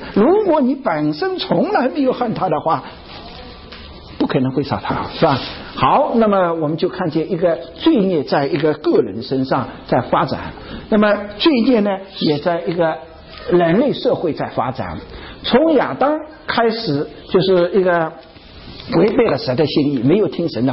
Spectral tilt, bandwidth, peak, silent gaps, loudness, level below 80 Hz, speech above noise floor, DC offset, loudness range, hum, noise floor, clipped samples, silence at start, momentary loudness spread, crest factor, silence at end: -11 dB/octave; 5.8 kHz; -2 dBFS; none; -17 LUFS; -44 dBFS; 21 dB; under 0.1%; 3 LU; none; -37 dBFS; under 0.1%; 0 s; 14 LU; 14 dB; 0 s